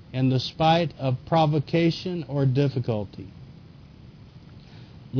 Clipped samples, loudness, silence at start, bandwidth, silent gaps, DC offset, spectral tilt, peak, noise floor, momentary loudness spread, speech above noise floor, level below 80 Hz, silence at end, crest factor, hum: under 0.1%; -24 LUFS; 0.1 s; 5.4 kHz; none; under 0.1%; -7.5 dB/octave; -8 dBFS; -47 dBFS; 15 LU; 23 dB; -54 dBFS; 0 s; 16 dB; none